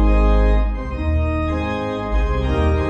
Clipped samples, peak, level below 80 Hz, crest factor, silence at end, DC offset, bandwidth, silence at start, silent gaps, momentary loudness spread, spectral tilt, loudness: under 0.1%; -6 dBFS; -20 dBFS; 12 dB; 0 s; under 0.1%; 6.6 kHz; 0 s; none; 7 LU; -8.5 dB/octave; -20 LUFS